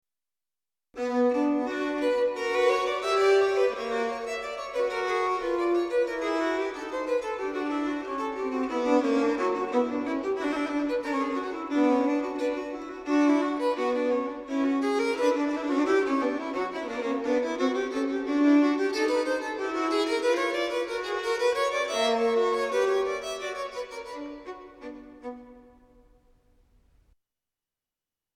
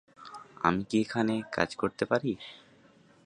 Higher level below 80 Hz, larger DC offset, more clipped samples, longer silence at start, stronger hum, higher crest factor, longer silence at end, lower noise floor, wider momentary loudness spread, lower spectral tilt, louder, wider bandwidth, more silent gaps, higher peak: about the same, -62 dBFS vs -62 dBFS; neither; neither; first, 0.95 s vs 0.2 s; neither; second, 16 dB vs 24 dB; first, 2.8 s vs 0.7 s; first, under -90 dBFS vs -60 dBFS; second, 10 LU vs 19 LU; second, -3 dB/octave vs -6 dB/octave; first, -27 LUFS vs -30 LUFS; first, 13 kHz vs 10.5 kHz; neither; second, -12 dBFS vs -8 dBFS